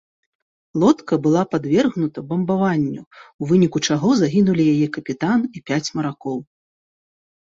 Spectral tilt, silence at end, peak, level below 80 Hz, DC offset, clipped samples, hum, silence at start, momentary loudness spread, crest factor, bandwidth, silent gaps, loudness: -6.5 dB/octave; 1.15 s; -4 dBFS; -58 dBFS; under 0.1%; under 0.1%; none; 0.75 s; 10 LU; 16 dB; 7.8 kHz; 3.07-3.11 s, 3.34-3.39 s; -19 LUFS